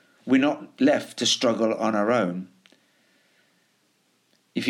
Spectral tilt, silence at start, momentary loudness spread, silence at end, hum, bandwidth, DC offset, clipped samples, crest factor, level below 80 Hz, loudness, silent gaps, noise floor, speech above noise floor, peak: -4 dB/octave; 0.25 s; 10 LU; 0 s; none; 13 kHz; under 0.1%; under 0.1%; 16 dB; -76 dBFS; -23 LUFS; none; -67 dBFS; 44 dB; -10 dBFS